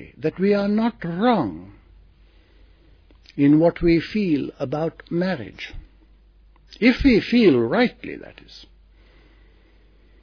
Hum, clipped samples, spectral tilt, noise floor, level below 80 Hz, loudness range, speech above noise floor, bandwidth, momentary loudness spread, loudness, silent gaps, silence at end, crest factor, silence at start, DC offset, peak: none; under 0.1%; -8 dB/octave; -53 dBFS; -42 dBFS; 3 LU; 33 dB; 5.4 kHz; 20 LU; -20 LUFS; none; 1.65 s; 18 dB; 0.2 s; under 0.1%; -4 dBFS